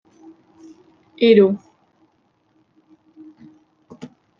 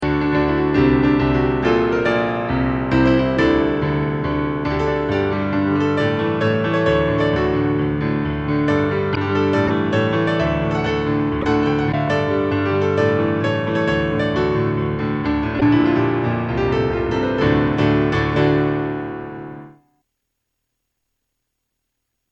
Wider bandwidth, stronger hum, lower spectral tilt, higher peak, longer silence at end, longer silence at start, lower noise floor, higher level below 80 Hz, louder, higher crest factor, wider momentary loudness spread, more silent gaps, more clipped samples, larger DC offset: second, 5.8 kHz vs 7.8 kHz; neither; about the same, -8 dB/octave vs -8 dB/octave; about the same, -2 dBFS vs -4 dBFS; first, 2.8 s vs 2.6 s; first, 1.2 s vs 0 s; second, -64 dBFS vs -76 dBFS; second, -72 dBFS vs -36 dBFS; about the same, -16 LUFS vs -18 LUFS; about the same, 20 dB vs 16 dB; first, 28 LU vs 5 LU; neither; neither; neither